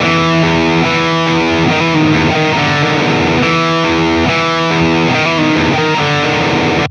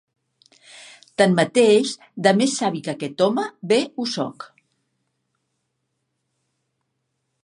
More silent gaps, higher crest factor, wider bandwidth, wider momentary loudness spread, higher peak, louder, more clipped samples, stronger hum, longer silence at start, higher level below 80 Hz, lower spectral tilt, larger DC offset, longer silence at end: neither; second, 12 dB vs 22 dB; second, 9.4 kHz vs 11.5 kHz; second, 1 LU vs 13 LU; about the same, 0 dBFS vs -2 dBFS; first, -11 LUFS vs -20 LUFS; neither; neither; second, 0 s vs 1.2 s; first, -36 dBFS vs -72 dBFS; about the same, -5.5 dB/octave vs -4.5 dB/octave; neither; second, 0 s vs 3 s